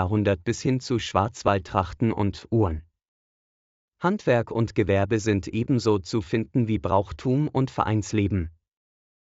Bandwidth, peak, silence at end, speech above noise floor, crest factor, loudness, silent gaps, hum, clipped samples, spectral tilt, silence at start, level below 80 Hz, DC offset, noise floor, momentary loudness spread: 8 kHz; -6 dBFS; 0.85 s; over 66 dB; 18 dB; -25 LUFS; 3.08-3.92 s; none; under 0.1%; -6.5 dB/octave; 0 s; -46 dBFS; under 0.1%; under -90 dBFS; 4 LU